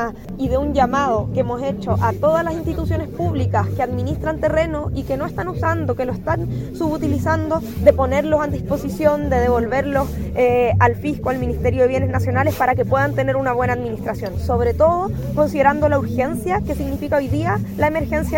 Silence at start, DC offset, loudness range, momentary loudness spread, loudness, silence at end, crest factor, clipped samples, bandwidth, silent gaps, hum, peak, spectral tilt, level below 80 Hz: 0 s; under 0.1%; 3 LU; 7 LU; -19 LUFS; 0 s; 18 dB; under 0.1%; 17 kHz; none; none; 0 dBFS; -7.5 dB/octave; -32 dBFS